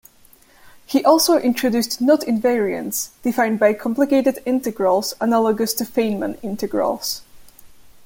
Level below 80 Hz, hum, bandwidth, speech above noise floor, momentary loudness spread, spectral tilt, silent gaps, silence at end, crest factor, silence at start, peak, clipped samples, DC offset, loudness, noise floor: -56 dBFS; none; 17 kHz; 32 dB; 9 LU; -4 dB/octave; none; 0.15 s; 18 dB; 0.65 s; -2 dBFS; under 0.1%; under 0.1%; -19 LUFS; -51 dBFS